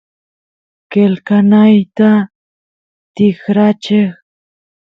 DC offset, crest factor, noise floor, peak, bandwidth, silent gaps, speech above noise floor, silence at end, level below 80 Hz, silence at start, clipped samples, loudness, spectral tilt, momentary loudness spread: under 0.1%; 12 dB; under -90 dBFS; 0 dBFS; 6.2 kHz; 2.35-3.15 s; over 80 dB; 0.75 s; -58 dBFS; 0.9 s; under 0.1%; -11 LUFS; -8.5 dB/octave; 7 LU